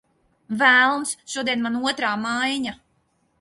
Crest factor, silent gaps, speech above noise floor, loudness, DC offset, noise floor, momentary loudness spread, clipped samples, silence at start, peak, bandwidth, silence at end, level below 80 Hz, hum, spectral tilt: 20 dB; none; 45 dB; -21 LUFS; under 0.1%; -67 dBFS; 13 LU; under 0.1%; 0.5 s; -4 dBFS; 11.5 kHz; 0.65 s; -66 dBFS; none; -2 dB/octave